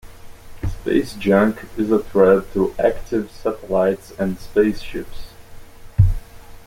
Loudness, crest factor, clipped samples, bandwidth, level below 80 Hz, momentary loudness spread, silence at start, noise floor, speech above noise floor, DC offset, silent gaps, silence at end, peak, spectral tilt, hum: -19 LUFS; 18 dB; under 0.1%; 16.5 kHz; -32 dBFS; 15 LU; 0.05 s; -38 dBFS; 19 dB; under 0.1%; none; 0.05 s; -2 dBFS; -8 dB/octave; none